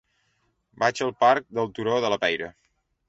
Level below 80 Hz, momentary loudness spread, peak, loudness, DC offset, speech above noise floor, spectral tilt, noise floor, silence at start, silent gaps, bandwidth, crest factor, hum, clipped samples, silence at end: -64 dBFS; 9 LU; -4 dBFS; -24 LUFS; under 0.1%; 47 dB; -4 dB/octave; -71 dBFS; 0.8 s; none; 8 kHz; 22 dB; none; under 0.1%; 0.6 s